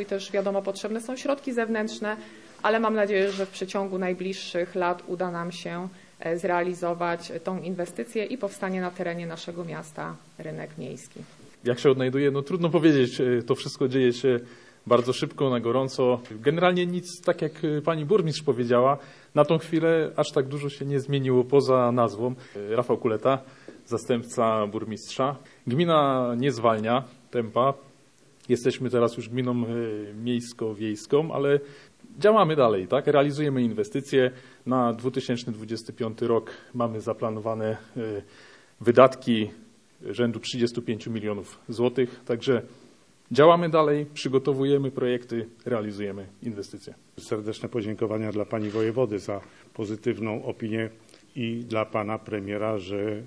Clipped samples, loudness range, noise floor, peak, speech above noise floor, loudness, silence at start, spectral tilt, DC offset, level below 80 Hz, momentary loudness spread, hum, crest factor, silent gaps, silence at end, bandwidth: under 0.1%; 7 LU; -58 dBFS; -2 dBFS; 33 dB; -26 LUFS; 0 s; -6.5 dB/octave; under 0.1%; -72 dBFS; 14 LU; none; 24 dB; none; 0 s; 11 kHz